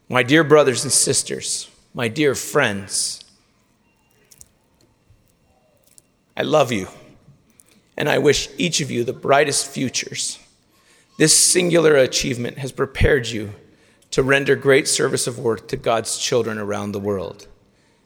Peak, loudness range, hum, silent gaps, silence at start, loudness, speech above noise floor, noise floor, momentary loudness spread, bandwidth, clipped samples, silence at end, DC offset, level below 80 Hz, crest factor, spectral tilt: 0 dBFS; 9 LU; none; none; 0.1 s; -18 LUFS; 42 dB; -61 dBFS; 12 LU; 19.5 kHz; under 0.1%; 0.6 s; under 0.1%; -40 dBFS; 20 dB; -3 dB/octave